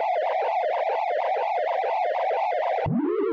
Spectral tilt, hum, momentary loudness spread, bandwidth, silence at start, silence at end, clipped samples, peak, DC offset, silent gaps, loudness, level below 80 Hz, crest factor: -7.5 dB/octave; none; 1 LU; 7 kHz; 0 s; 0 s; under 0.1%; -18 dBFS; under 0.1%; none; -25 LUFS; -58 dBFS; 6 dB